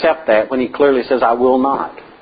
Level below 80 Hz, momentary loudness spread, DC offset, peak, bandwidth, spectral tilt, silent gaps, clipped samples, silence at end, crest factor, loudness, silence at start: -50 dBFS; 6 LU; under 0.1%; -2 dBFS; 5 kHz; -10.5 dB/octave; none; under 0.1%; 0.2 s; 14 dB; -15 LUFS; 0 s